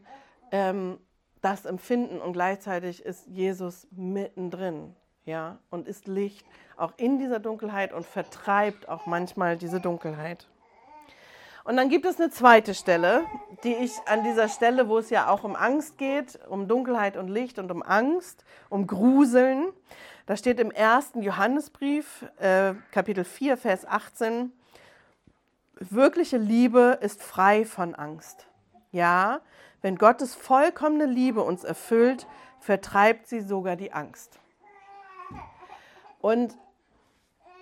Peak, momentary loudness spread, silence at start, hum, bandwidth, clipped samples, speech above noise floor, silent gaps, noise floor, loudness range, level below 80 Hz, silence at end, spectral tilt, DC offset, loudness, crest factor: -2 dBFS; 16 LU; 0.1 s; none; 16.5 kHz; under 0.1%; 41 dB; none; -66 dBFS; 9 LU; -68 dBFS; 1.1 s; -5.5 dB/octave; under 0.1%; -25 LUFS; 24 dB